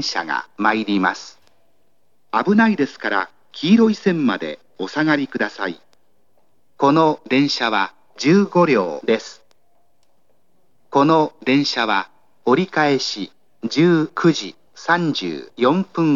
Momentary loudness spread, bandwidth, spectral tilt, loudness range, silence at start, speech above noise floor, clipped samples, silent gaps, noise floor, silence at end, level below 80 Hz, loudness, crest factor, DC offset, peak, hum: 13 LU; 7.6 kHz; -5.5 dB/octave; 3 LU; 0 s; 49 dB; under 0.1%; none; -67 dBFS; 0 s; -80 dBFS; -18 LUFS; 18 dB; 0.3%; -2 dBFS; none